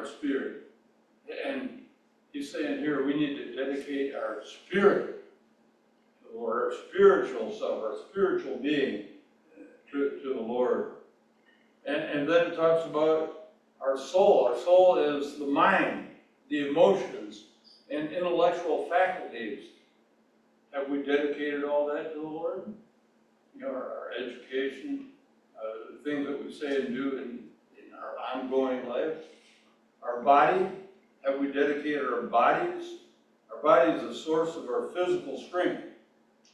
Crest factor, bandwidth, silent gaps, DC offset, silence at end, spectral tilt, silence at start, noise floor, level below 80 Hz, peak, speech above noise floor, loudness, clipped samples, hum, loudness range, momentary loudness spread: 22 dB; 11 kHz; none; under 0.1%; 0.6 s; -5.5 dB/octave; 0 s; -66 dBFS; -76 dBFS; -8 dBFS; 38 dB; -28 LUFS; under 0.1%; none; 10 LU; 17 LU